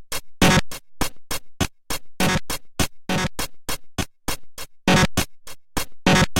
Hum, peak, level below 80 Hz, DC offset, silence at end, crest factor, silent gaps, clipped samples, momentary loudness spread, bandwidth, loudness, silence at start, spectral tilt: none; -4 dBFS; -36 dBFS; under 0.1%; 0 s; 20 dB; none; under 0.1%; 14 LU; 17 kHz; -23 LUFS; 0 s; -4 dB/octave